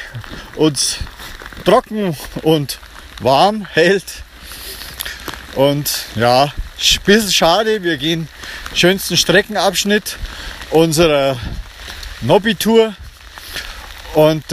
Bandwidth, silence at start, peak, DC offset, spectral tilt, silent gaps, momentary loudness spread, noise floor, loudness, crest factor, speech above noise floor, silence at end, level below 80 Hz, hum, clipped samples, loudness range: 15.5 kHz; 0 s; 0 dBFS; under 0.1%; -3.5 dB/octave; none; 18 LU; -34 dBFS; -15 LUFS; 16 dB; 20 dB; 0 s; -36 dBFS; none; under 0.1%; 3 LU